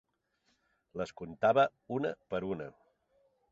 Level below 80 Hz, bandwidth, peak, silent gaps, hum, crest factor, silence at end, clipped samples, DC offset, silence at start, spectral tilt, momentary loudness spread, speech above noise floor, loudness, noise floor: -68 dBFS; 7.6 kHz; -14 dBFS; none; none; 22 dB; 0.8 s; under 0.1%; under 0.1%; 0.95 s; -4.5 dB/octave; 14 LU; 44 dB; -33 LUFS; -77 dBFS